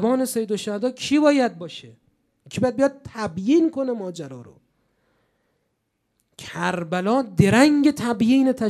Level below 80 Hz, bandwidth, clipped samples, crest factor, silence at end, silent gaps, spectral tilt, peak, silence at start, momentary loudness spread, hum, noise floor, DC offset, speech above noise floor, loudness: -58 dBFS; 14 kHz; under 0.1%; 18 dB; 0 s; none; -6 dB/octave; -4 dBFS; 0 s; 19 LU; none; -74 dBFS; under 0.1%; 53 dB; -21 LUFS